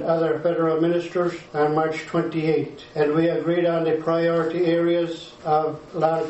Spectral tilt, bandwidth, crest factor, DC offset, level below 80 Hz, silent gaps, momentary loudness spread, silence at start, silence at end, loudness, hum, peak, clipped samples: -7.5 dB/octave; 8.2 kHz; 16 dB; under 0.1%; -62 dBFS; none; 5 LU; 0 s; 0 s; -22 LUFS; none; -6 dBFS; under 0.1%